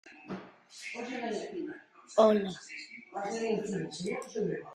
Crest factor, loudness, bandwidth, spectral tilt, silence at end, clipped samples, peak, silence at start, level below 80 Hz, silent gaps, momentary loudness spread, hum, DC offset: 24 dB; -33 LUFS; 12 kHz; -5 dB/octave; 0 s; under 0.1%; -10 dBFS; 0.05 s; -74 dBFS; none; 19 LU; none; under 0.1%